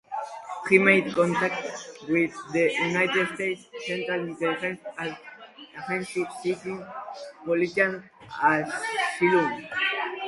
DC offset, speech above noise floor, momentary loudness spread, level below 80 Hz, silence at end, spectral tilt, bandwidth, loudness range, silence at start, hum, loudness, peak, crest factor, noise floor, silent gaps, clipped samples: under 0.1%; 20 dB; 16 LU; -70 dBFS; 0 s; -5 dB/octave; 11.5 kHz; 8 LU; 0.1 s; none; -25 LUFS; -4 dBFS; 24 dB; -45 dBFS; none; under 0.1%